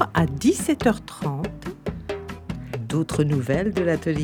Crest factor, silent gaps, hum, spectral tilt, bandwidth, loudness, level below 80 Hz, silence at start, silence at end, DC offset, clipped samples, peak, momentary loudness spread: 20 dB; none; none; -6 dB/octave; 19 kHz; -24 LUFS; -42 dBFS; 0 s; 0 s; under 0.1%; under 0.1%; -4 dBFS; 12 LU